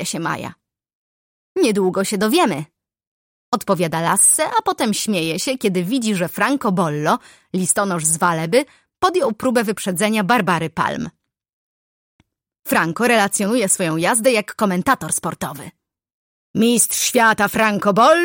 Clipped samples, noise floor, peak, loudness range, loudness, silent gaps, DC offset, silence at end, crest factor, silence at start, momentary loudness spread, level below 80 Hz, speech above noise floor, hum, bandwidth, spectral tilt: under 0.1%; under -90 dBFS; -2 dBFS; 4 LU; -17 LUFS; 0.95-1.55 s, 3.07-3.52 s, 11.53-12.19 s, 16.14-16.54 s; under 0.1%; 0 s; 16 dB; 0 s; 11 LU; -58 dBFS; over 72 dB; none; 17 kHz; -3.5 dB/octave